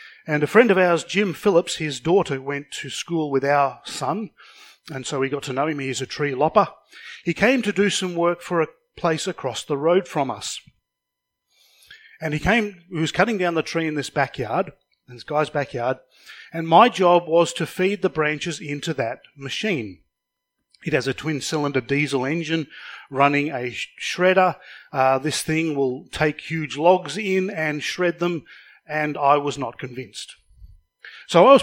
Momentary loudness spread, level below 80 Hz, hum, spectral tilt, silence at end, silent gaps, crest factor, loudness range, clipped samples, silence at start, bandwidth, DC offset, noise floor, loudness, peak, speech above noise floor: 13 LU; -54 dBFS; none; -5 dB/octave; 0 s; none; 22 dB; 6 LU; under 0.1%; 0 s; 17 kHz; under 0.1%; -82 dBFS; -22 LUFS; 0 dBFS; 60 dB